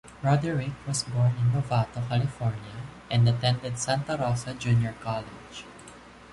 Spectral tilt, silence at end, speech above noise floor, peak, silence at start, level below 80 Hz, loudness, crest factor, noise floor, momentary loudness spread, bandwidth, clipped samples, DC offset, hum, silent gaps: -5.5 dB/octave; 0 s; 22 dB; -12 dBFS; 0.05 s; -52 dBFS; -27 LUFS; 16 dB; -48 dBFS; 17 LU; 11.5 kHz; under 0.1%; under 0.1%; none; none